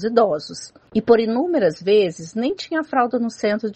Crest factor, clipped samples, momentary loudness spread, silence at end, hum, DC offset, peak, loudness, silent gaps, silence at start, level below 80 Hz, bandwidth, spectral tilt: 18 dB; under 0.1%; 9 LU; 0 s; none; under 0.1%; -2 dBFS; -20 LUFS; none; 0 s; -62 dBFS; 8.6 kHz; -5.5 dB/octave